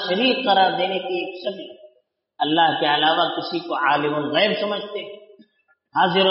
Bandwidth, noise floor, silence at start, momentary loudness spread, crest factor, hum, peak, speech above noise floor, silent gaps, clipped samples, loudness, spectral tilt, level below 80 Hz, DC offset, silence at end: 5.8 kHz; -64 dBFS; 0 s; 13 LU; 18 dB; none; -4 dBFS; 44 dB; none; under 0.1%; -20 LUFS; -1.5 dB/octave; -72 dBFS; under 0.1%; 0 s